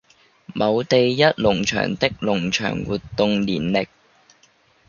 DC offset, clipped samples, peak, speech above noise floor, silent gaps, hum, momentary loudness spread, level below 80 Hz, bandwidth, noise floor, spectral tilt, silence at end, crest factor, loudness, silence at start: under 0.1%; under 0.1%; -2 dBFS; 38 dB; none; none; 8 LU; -48 dBFS; 7.2 kHz; -58 dBFS; -5 dB/octave; 1.05 s; 20 dB; -20 LUFS; 0.5 s